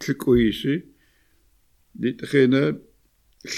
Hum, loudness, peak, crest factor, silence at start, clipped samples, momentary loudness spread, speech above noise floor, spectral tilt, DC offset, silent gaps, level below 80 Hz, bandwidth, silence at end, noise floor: none; -21 LUFS; -6 dBFS; 18 dB; 0 s; under 0.1%; 11 LU; 41 dB; -6 dB/octave; under 0.1%; none; -46 dBFS; 14.5 kHz; 0 s; -61 dBFS